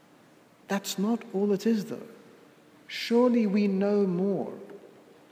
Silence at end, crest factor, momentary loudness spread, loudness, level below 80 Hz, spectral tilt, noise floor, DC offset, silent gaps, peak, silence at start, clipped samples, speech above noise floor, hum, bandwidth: 0.45 s; 16 dB; 16 LU; -27 LUFS; -84 dBFS; -6 dB/octave; -57 dBFS; under 0.1%; none; -12 dBFS; 0.7 s; under 0.1%; 31 dB; none; 16 kHz